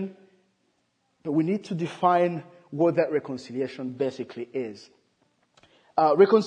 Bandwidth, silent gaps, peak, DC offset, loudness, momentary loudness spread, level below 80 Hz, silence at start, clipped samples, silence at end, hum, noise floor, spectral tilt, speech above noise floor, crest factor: 9.6 kHz; none; -4 dBFS; under 0.1%; -26 LUFS; 15 LU; -78 dBFS; 0 s; under 0.1%; 0 s; none; -72 dBFS; -7.5 dB/octave; 48 dB; 22 dB